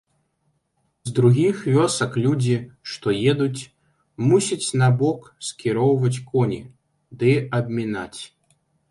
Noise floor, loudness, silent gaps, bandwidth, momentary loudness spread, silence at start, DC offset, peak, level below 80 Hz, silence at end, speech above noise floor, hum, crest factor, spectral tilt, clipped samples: -70 dBFS; -21 LUFS; none; 11.5 kHz; 15 LU; 1.05 s; under 0.1%; -4 dBFS; -58 dBFS; 0.65 s; 50 dB; none; 18 dB; -6 dB/octave; under 0.1%